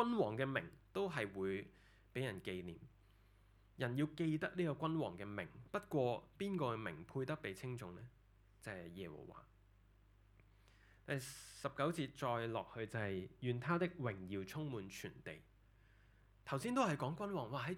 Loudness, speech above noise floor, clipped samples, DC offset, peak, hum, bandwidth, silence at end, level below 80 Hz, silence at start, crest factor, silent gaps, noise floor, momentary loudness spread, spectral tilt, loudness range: -43 LUFS; 26 dB; under 0.1%; under 0.1%; -22 dBFS; none; 17.5 kHz; 0 s; -70 dBFS; 0 s; 22 dB; none; -69 dBFS; 14 LU; -6 dB/octave; 9 LU